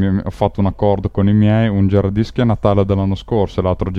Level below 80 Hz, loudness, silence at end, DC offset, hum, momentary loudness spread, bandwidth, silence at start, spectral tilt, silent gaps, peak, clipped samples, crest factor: -34 dBFS; -16 LUFS; 0 s; under 0.1%; none; 5 LU; 6.6 kHz; 0 s; -9.5 dB/octave; none; 0 dBFS; under 0.1%; 14 dB